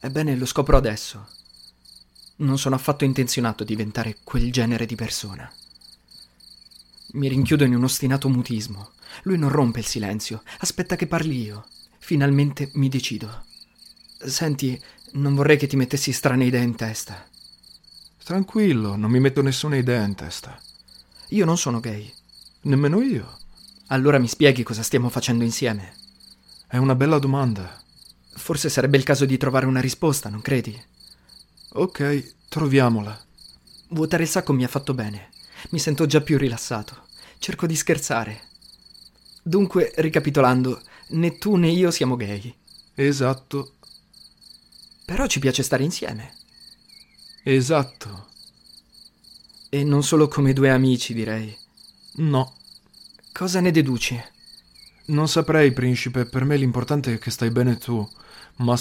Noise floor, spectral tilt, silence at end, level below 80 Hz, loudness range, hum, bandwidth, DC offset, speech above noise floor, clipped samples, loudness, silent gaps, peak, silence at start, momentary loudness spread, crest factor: -51 dBFS; -5.5 dB/octave; 0 s; -40 dBFS; 4 LU; none; 16.5 kHz; under 0.1%; 30 dB; under 0.1%; -22 LUFS; none; 0 dBFS; 0.05 s; 17 LU; 22 dB